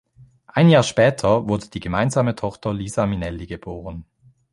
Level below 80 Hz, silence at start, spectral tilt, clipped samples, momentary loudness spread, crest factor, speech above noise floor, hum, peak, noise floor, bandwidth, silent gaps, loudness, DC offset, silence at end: -44 dBFS; 0.55 s; -6 dB/octave; under 0.1%; 18 LU; 18 dB; 30 dB; none; -2 dBFS; -50 dBFS; 11.5 kHz; none; -20 LUFS; under 0.1%; 0.5 s